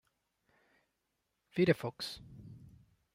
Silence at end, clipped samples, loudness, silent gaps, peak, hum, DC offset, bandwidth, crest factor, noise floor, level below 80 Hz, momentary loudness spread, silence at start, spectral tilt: 0.6 s; under 0.1%; -34 LUFS; none; -14 dBFS; none; under 0.1%; 16 kHz; 24 dB; -84 dBFS; -68 dBFS; 23 LU; 1.55 s; -6.5 dB/octave